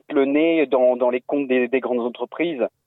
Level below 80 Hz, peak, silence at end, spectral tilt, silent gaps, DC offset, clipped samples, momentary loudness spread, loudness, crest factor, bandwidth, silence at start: -70 dBFS; -8 dBFS; 0.2 s; -8.5 dB/octave; none; under 0.1%; under 0.1%; 7 LU; -20 LUFS; 12 dB; 4.1 kHz; 0.1 s